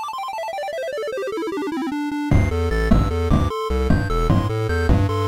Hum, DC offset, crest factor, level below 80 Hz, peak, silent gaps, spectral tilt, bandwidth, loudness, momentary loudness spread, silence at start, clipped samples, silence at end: none; under 0.1%; 14 dB; -26 dBFS; -4 dBFS; none; -7.5 dB/octave; 15.5 kHz; -22 LUFS; 7 LU; 0 s; under 0.1%; 0 s